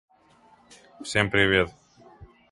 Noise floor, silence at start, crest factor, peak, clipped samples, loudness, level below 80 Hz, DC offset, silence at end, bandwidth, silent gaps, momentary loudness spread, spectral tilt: -58 dBFS; 1 s; 24 dB; -4 dBFS; under 0.1%; -23 LUFS; -50 dBFS; under 0.1%; 0.25 s; 11.5 kHz; none; 12 LU; -4.5 dB/octave